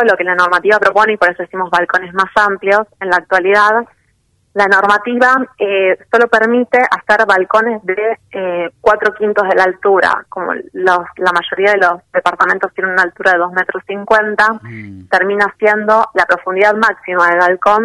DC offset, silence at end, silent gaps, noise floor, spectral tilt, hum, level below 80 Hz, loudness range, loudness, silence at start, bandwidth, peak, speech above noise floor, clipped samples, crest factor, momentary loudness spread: under 0.1%; 0 s; none; -58 dBFS; -4.5 dB/octave; none; -54 dBFS; 2 LU; -12 LUFS; 0 s; 11.5 kHz; 0 dBFS; 46 dB; under 0.1%; 12 dB; 7 LU